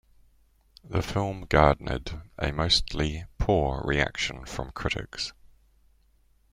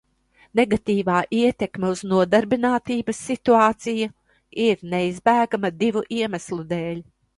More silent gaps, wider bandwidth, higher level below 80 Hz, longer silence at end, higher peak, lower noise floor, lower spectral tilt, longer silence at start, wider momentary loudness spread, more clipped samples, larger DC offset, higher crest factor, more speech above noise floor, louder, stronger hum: neither; first, 15 kHz vs 11.5 kHz; first, -38 dBFS vs -56 dBFS; first, 1.05 s vs 0.35 s; about the same, -4 dBFS vs -4 dBFS; first, -63 dBFS vs -59 dBFS; about the same, -5 dB/octave vs -5.5 dB/octave; first, 0.85 s vs 0.55 s; first, 12 LU vs 9 LU; neither; neither; first, 24 dB vs 18 dB; about the same, 36 dB vs 38 dB; second, -27 LUFS vs -22 LUFS; neither